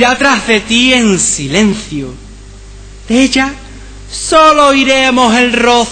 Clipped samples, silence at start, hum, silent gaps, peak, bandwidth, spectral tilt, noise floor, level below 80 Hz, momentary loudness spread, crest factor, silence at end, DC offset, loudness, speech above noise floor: 0.8%; 0 s; none; none; 0 dBFS; 11 kHz; -3 dB/octave; -31 dBFS; -32 dBFS; 14 LU; 10 dB; 0 s; under 0.1%; -9 LUFS; 22 dB